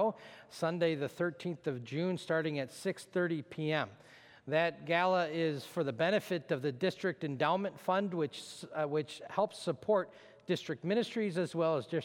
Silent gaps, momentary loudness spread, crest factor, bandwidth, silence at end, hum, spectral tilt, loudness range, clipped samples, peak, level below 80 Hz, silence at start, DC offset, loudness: none; 7 LU; 20 dB; 17 kHz; 0 s; none; -6 dB/octave; 3 LU; under 0.1%; -16 dBFS; -80 dBFS; 0 s; under 0.1%; -35 LUFS